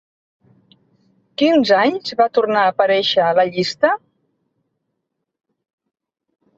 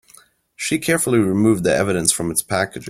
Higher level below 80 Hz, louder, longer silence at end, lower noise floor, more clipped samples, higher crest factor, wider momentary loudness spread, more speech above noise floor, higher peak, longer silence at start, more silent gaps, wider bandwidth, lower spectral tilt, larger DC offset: second, -66 dBFS vs -50 dBFS; about the same, -16 LUFS vs -18 LUFS; first, 2.6 s vs 0 s; first, -77 dBFS vs -51 dBFS; neither; about the same, 18 dB vs 18 dB; about the same, 5 LU vs 6 LU; first, 61 dB vs 33 dB; about the same, -2 dBFS vs 0 dBFS; first, 1.4 s vs 0.6 s; neither; second, 7.8 kHz vs 16.5 kHz; about the same, -5 dB/octave vs -4 dB/octave; neither